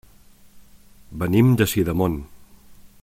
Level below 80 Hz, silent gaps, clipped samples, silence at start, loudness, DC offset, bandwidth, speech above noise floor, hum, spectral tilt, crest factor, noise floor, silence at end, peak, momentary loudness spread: -44 dBFS; none; under 0.1%; 0.55 s; -20 LUFS; under 0.1%; 16.5 kHz; 31 dB; none; -6.5 dB/octave; 18 dB; -49 dBFS; 0.2 s; -4 dBFS; 15 LU